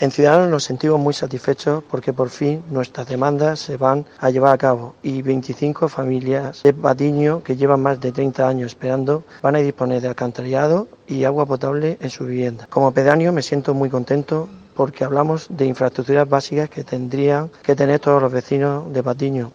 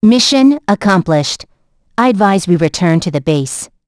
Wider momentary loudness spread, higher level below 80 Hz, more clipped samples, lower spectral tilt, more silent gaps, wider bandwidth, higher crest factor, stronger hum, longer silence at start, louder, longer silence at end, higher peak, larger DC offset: about the same, 8 LU vs 10 LU; second, -60 dBFS vs -46 dBFS; neither; first, -7 dB/octave vs -5 dB/octave; neither; second, 8 kHz vs 11 kHz; first, 18 dB vs 12 dB; neither; about the same, 0 s vs 0 s; second, -19 LUFS vs -12 LUFS; second, 0.05 s vs 0.2 s; about the same, 0 dBFS vs 0 dBFS; neither